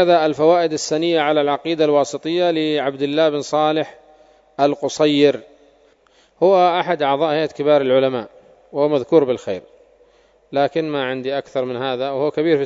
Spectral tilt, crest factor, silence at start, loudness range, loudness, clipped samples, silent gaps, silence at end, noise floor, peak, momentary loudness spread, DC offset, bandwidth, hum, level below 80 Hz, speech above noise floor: -5 dB/octave; 18 dB; 0 s; 4 LU; -18 LUFS; under 0.1%; none; 0 s; -56 dBFS; 0 dBFS; 9 LU; under 0.1%; 7.8 kHz; none; -66 dBFS; 38 dB